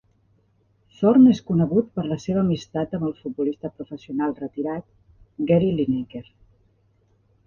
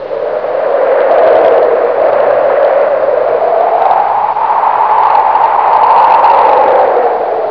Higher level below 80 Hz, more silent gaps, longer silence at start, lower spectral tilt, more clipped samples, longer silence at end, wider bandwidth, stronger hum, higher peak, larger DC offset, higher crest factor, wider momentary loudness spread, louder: about the same, -56 dBFS vs -54 dBFS; neither; first, 1 s vs 0 s; first, -8.5 dB/octave vs -6.5 dB/octave; second, under 0.1% vs 0.6%; first, 1.25 s vs 0 s; first, 7 kHz vs 5.4 kHz; neither; second, -6 dBFS vs 0 dBFS; second, under 0.1% vs 0.5%; first, 18 dB vs 8 dB; first, 17 LU vs 5 LU; second, -22 LUFS vs -9 LUFS